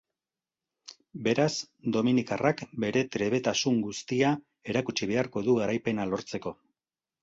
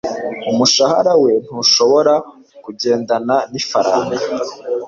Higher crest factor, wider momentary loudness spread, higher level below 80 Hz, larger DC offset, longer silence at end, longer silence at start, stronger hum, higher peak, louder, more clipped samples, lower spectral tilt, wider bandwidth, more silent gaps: first, 20 dB vs 14 dB; second, 7 LU vs 11 LU; second, -64 dBFS vs -58 dBFS; neither; first, 0.7 s vs 0 s; first, 0.9 s vs 0.05 s; neither; second, -10 dBFS vs -2 dBFS; second, -29 LUFS vs -15 LUFS; neither; first, -5 dB/octave vs -3 dB/octave; about the same, 8 kHz vs 7.6 kHz; neither